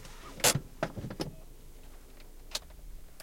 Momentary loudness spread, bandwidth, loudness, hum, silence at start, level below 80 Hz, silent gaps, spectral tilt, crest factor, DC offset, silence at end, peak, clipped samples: 28 LU; 16.5 kHz; -33 LUFS; none; 0 s; -48 dBFS; none; -2.5 dB/octave; 28 dB; under 0.1%; 0 s; -8 dBFS; under 0.1%